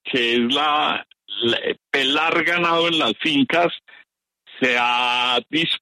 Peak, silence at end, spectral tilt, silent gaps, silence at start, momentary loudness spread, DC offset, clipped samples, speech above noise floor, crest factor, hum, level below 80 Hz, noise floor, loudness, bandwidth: -6 dBFS; 0 s; -4 dB/octave; none; 0.05 s; 6 LU; under 0.1%; under 0.1%; 36 dB; 14 dB; none; -66 dBFS; -56 dBFS; -19 LUFS; 13.5 kHz